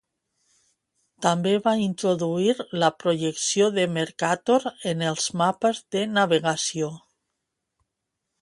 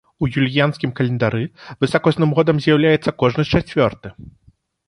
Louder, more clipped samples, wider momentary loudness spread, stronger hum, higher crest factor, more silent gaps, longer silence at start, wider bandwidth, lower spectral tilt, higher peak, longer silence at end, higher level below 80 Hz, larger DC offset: second, -24 LUFS vs -18 LUFS; neither; second, 5 LU vs 8 LU; neither; about the same, 20 dB vs 16 dB; neither; first, 1.2 s vs 0.2 s; about the same, 11.5 kHz vs 11 kHz; second, -4 dB/octave vs -7.5 dB/octave; second, -6 dBFS vs -2 dBFS; first, 1.45 s vs 0.6 s; second, -70 dBFS vs -44 dBFS; neither